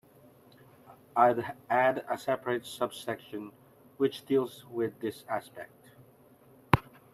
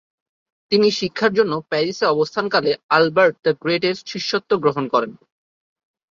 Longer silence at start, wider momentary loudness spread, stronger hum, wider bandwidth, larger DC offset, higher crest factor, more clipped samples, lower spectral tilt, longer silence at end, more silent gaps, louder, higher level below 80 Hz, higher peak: first, 0.9 s vs 0.7 s; first, 17 LU vs 6 LU; neither; first, 14.5 kHz vs 7.6 kHz; neither; first, 28 dB vs 18 dB; neither; about the same, -6 dB/octave vs -5 dB/octave; second, 0.35 s vs 0.95 s; second, none vs 2.83-2.89 s; second, -31 LUFS vs -19 LUFS; about the same, -60 dBFS vs -64 dBFS; about the same, -4 dBFS vs -2 dBFS